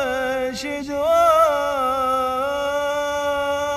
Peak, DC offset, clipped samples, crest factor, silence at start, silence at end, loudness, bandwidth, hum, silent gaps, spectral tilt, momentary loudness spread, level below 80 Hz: -6 dBFS; under 0.1%; under 0.1%; 14 dB; 0 s; 0 s; -20 LUFS; 14.5 kHz; none; none; -3 dB/octave; 9 LU; -48 dBFS